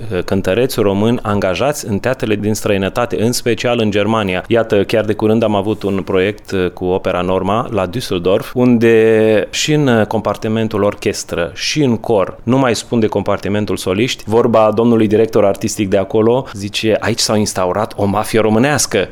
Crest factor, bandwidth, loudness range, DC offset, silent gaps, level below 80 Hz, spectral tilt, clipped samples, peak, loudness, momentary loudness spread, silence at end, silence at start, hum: 12 dB; 18 kHz; 2 LU; under 0.1%; none; -40 dBFS; -5 dB/octave; under 0.1%; -2 dBFS; -14 LUFS; 6 LU; 0 s; 0 s; none